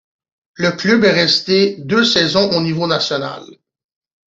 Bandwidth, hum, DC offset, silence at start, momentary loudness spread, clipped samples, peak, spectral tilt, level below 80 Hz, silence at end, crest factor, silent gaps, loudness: 7.8 kHz; none; under 0.1%; 0.6 s; 8 LU; under 0.1%; -2 dBFS; -4.5 dB/octave; -54 dBFS; 0.85 s; 16 dB; none; -14 LUFS